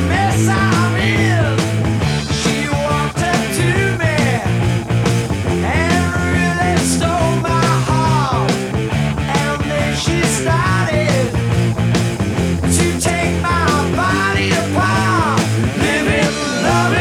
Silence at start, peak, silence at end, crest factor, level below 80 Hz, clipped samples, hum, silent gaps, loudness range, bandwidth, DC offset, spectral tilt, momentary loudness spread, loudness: 0 s; 0 dBFS; 0 s; 14 dB; -32 dBFS; under 0.1%; none; none; 1 LU; 16 kHz; under 0.1%; -5 dB/octave; 3 LU; -15 LUFS